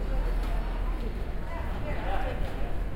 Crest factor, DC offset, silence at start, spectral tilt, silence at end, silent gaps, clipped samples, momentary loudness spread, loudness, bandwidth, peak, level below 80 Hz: 14 dB; under 0.1%; 0 s; -7 dB/octave; 0 s; none; under 0.1%; 4 LU; -34 LUFS; 11 kHz; -14 dBFS; -30 dBFS